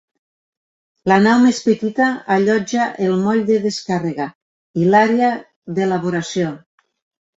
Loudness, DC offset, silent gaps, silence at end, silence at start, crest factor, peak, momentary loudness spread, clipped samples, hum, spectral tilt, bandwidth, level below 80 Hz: -17 LUFS; under 0.1%; 4.35-4.74 s, 5.56-5.62 s; 0.8 s; 1.05 s; 16 dB; -2 dBFS; 13 LU; under 0.1%; none; -6 dB/octave; 8 kHz; -60 dBFS